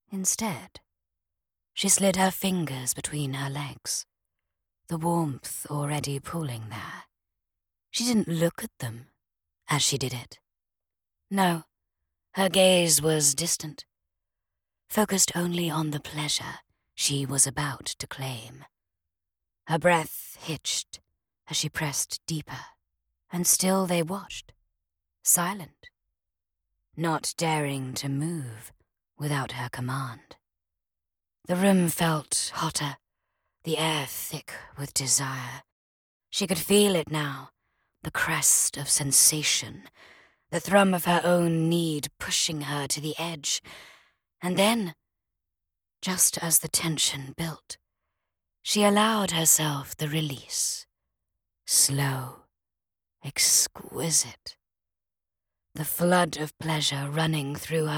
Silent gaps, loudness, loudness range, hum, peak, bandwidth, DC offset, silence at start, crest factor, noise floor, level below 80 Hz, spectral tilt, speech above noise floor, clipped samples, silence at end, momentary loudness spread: 35.72-36.20 s; -25 LUFS; 8 LU; none; -6 dBFS; 19 kHz; under 0.1%; 0.1 s; 24 dB; under -90 dBFS; -62 dBFS; -3 dB/octave; over 63 dB; under 0.1%; 0 s; 17 LU